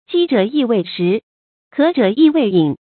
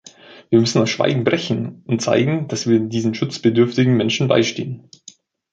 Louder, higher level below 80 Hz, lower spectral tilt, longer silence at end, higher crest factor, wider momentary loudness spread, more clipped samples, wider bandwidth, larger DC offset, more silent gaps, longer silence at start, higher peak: first, -15 LUFS vs -18 LUFS; second, -64 dBFS vs -58 dBFS; first, -12 dB/octave vs -5.5 dB/octave; second, 0.2 s vs 0.75 s; about the same, 14 dB vs 16 dB; about the same, 6 LU vs 8 LU; neither; second, 4.5 kHz vs 8.8 kHz; neither; first, 1.23-1.71 s vs none; second, 0.1 s vs 0.3 s; about the same, 0 dBFS vs -2 dBFS